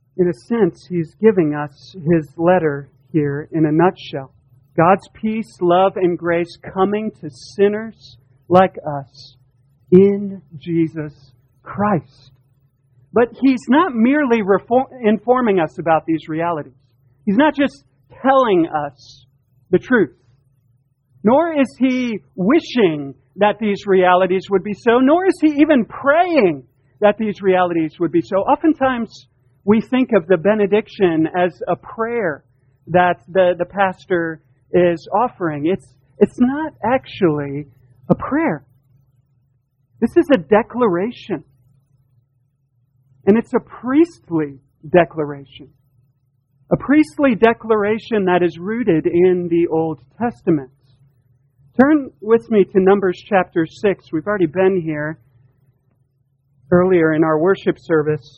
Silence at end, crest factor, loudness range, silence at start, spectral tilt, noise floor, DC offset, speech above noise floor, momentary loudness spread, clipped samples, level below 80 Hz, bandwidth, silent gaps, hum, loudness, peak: 0.2 s; 18 dB; 4 LU; 0.15 s; -8 dB/octave; -63 dBFS; under 0.1%; 47 dB; 11 LU; under 0.1%; -52 dBFS; 9.6 kHz; none; none; -17 LUFS; 0 dBFS